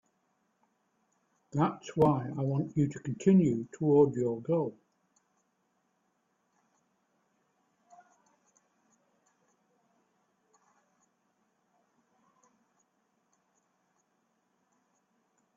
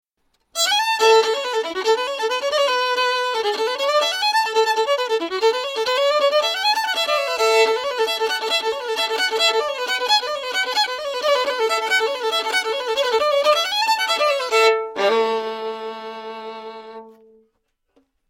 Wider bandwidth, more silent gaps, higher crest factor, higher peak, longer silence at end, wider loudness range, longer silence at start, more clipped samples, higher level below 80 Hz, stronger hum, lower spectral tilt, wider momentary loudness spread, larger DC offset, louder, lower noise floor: second, 7.6 kHz vs 16.5 kHz; neither; first, 24 dB vs 18 dB; second, -12 dBFS vs -2 dBFS; first, 10.85 s vs 1.2 s; first, 10 LU vs 2 LU; first, 1.55 s vs 0.55 s; neither; about the same, -70 dBFS vs -68 dBFS; neither; first, -8.5 dB/octave vs 0.5 dB/octave; about the same, 8 LU vs 8 LU; neither; second, -29 LUFS vs -19 LUFS; first, -77 dBFS vs -70 dBFS